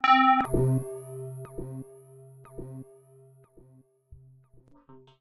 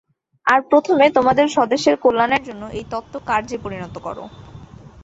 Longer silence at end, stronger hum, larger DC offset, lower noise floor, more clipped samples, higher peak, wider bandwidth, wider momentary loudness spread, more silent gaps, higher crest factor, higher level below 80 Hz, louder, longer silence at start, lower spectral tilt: about the same, 0.25 s vs 0.15 s; neither; neither; first, -59 dBFS vs -40 dBFS; neither; second, -8 dBFS vs -2 dBFS; first, 12.5 kHz vs 8 kHz; first, 25 LU vs 17 LU; neither; about the same, 20 dB vs 16 dB; about the same, -48 dBFS vs -50 dBFS; second, -26 LUFS vs -17 LUFS; second, 0.05 s vs 0.45 s; first, -6.5 dB/octave vs -5 dB/octave